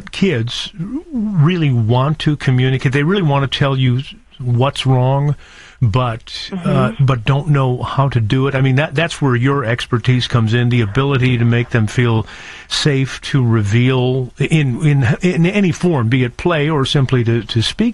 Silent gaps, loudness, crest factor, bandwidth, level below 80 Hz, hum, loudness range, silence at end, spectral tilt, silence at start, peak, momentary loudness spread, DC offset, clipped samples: none; -15 LUFS; 12 dB; 11 kHz; -40 dBFS; none; 2 LU; 0 s; -6.5 dB/octave; 0 s; -2 dBFS; 6 LU; 0.2%; under 0.1%